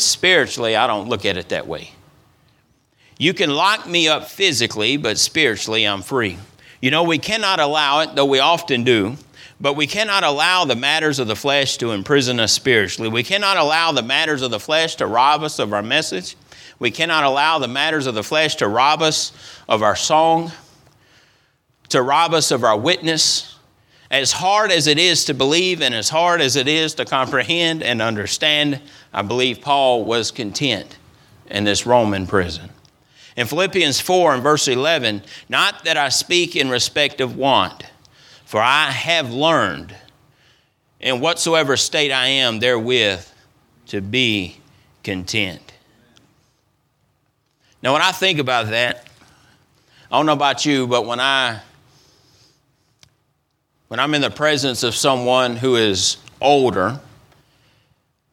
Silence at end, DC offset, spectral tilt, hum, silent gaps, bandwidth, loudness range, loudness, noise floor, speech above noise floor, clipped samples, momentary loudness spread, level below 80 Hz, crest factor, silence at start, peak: 1.3 s; under 0.1%; -3 dB/octave; none; none; 18.5 kHz; 5 LU; -17 LUFS; -67 dBFS; 50 dB; under 0.1%; 8 LU; -56 dBFS; 18 dB; 0 s; 0 dBFS